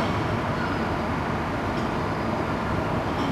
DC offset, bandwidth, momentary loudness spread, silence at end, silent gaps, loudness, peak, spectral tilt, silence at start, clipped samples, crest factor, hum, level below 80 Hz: under 0.1%; 13 kHz; 1 LU; 0 s; none; -26 LUFS; -14 dBFS; -6.5 dB/octave; 0 s; under 0.1%; 12 dB; none; -40 dBFS